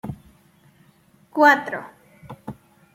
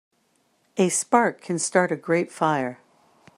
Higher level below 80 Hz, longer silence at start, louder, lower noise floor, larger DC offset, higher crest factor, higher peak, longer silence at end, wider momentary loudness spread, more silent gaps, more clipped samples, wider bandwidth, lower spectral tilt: first, -58 dBFS vs -74 dBFS; second, 0.05 s vs 0.75 s; first, -19 LUFS vs -23 LUFS; second, -57 dBFS vs -67 dBFS; neither; about the same, 22 dB vs 22 dB; about the same, -2 dBFS vs -4 dBFS; second, 0.4 s vs 0.65 s; first, 26 LU vs 7 LU; neither; neither; first, 16 kHz vs 13.5 kHz; about the same, -5 dB/octave vs -4.5 dB/octave